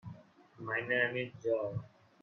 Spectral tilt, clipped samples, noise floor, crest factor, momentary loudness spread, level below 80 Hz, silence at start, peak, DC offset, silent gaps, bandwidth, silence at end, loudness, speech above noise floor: -7 dB/octave; under 0.1%; -56 dBFS; 20 dB; 18 LU; -72 dBFS; 0.05 s; -18 dBFS; under 0.1%; none; 6.6 kHz; 0.35 s; -35 LUFS; 21 dB